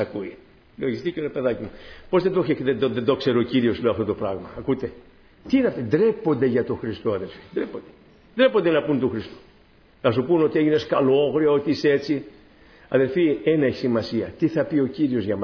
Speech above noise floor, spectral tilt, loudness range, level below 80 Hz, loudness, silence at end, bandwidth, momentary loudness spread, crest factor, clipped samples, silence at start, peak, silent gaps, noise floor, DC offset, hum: 32 dB; -8 dB/octave; 3 LU; -54 dBFS; -22 LUFS; 0 s; 5.4 kHz; 10 LU; 16 dB; under 0.1%; 0 s; -6 dBFS; none; -54 dBFS; under 0.1%; none